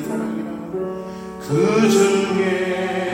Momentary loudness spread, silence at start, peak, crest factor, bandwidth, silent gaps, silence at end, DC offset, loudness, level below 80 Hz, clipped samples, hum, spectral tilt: 14 LU; 0 s; -4 dBFS; 16 dB; 16.5 kHz; none; 0 s; under 0.1%; -19 LUFS; -54 dBFS; under 0.1%; none; -5.5 dB/octave